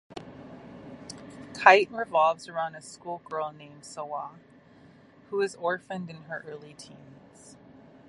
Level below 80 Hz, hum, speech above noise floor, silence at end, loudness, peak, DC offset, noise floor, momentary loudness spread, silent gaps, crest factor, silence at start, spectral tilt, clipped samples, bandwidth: -70 dBFS; none; 27 dB; 1.25 s; -27 LUFS; -2 dBFS; under 0.1%; -55 dBFS; 25 LU; none; 28 dB; 0.15 s; -4 dB/octave; under 0.1%; 11.5 kHz